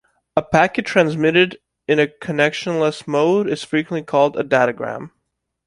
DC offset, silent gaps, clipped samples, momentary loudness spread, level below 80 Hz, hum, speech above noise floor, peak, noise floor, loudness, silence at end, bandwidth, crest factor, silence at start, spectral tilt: under 0.1%; none; under 0.1%; 8 LU; -56 dBFS; none; 57 dB; 0 dBFS; -74 dBFS; -18 LUFS; 0.6 s; 11.5 kHz; 18 dB; 0.35 s; -5.5 dB/octave